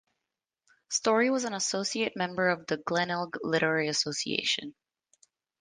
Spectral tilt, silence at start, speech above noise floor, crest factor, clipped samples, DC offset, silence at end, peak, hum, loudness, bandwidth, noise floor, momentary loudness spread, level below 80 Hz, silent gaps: -3 dB/octave; 0.9 s; 58 dB; 20 dB; under 0.1%; under 0.1%; 0.9 s; -10 dBFS; none; -29 LUFS; 11 kHz; -88 dBFS; 6 LU; -74 dBFS; none